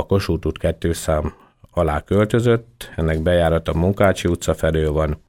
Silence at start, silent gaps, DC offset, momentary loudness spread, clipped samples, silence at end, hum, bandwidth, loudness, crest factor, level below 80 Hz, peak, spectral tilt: 0 s; none; under 0.1%; 6 LU; under 0.1%; 0.15 s; none; 17 kHz; -20 LUFS; 18 dB; -32 dBFS; -2 dBFS; -6.5 dB/octave